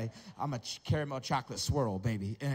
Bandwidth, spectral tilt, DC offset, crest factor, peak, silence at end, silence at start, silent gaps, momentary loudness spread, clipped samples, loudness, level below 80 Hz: 16 kHz; -5.5 dB/octave; under 0.1%; 14 dB; -20 dBFS; 0 s; 0 s; none; 7 LU; under 0.1%; -35 LUFS; -52 dBFS